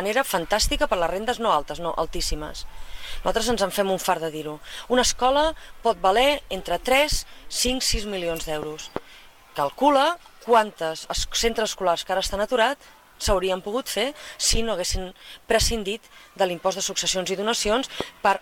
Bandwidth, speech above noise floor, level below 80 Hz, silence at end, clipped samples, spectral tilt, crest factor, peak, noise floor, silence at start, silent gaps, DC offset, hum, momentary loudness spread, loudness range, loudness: 18 kHz; 24 dB; -36 dBFS; 0 s; under 0.1%; -2.5 dB/octave; 18 dB; -6 dBFS; -48 dBFS; 0 s; none; under 0.1%; none; 13 LU; 3 LU; -24 LUFS